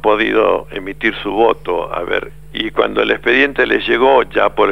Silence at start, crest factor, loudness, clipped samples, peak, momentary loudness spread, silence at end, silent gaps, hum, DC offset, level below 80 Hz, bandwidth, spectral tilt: 0.05 s; 14 dB; -15 LUFS; under 0.1%; 0 dBFS; 8 LU; 0 s; none; none; 1%; -40 dBFS; 15 kHz; -6 dB/octave